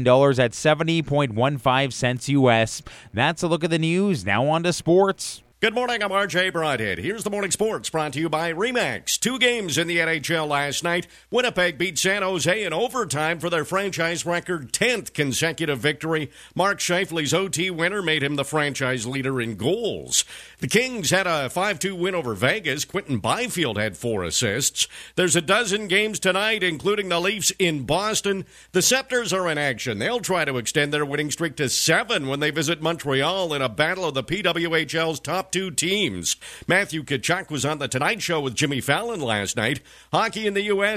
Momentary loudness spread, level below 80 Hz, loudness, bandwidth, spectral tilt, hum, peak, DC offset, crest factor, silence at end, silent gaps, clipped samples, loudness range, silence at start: 6 LU; -54 dBFS; -22 LUFS; 14.5 kHz; -3.5 dB/octave; none; -2 dBFS; under 0.1%; 20 dB; 0 s; none; under 0.1%; 2 LU; 0 s